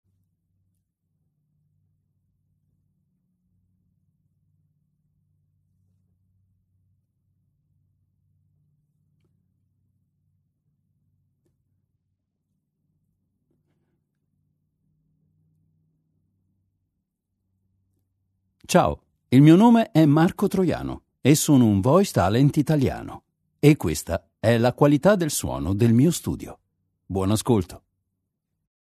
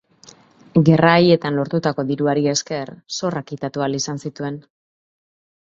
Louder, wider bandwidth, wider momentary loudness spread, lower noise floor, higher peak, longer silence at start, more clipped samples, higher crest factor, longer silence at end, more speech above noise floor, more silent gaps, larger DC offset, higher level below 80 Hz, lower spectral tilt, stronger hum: about the same, -20 LUFS vs -19 LUFS; first, 13.5 kHz vs 7.8 kHz; about the same, 15 LU vs 15 LU; first, -79 dBFS vs -49 dBFS; about the same, -2 dBFS vs 0 dBFS; first, 18.7 s vs 0.75 s; neither; about the same, 22 dB vs 20 dB; about the same, 1.1 s vs 1.1 s; first, 60 dB vs 30 dB; neither; neither; first, -50 dBFS vs -58 dBFS; about the same, -6.5 dB/octave vs -5.5 dB/octave; neither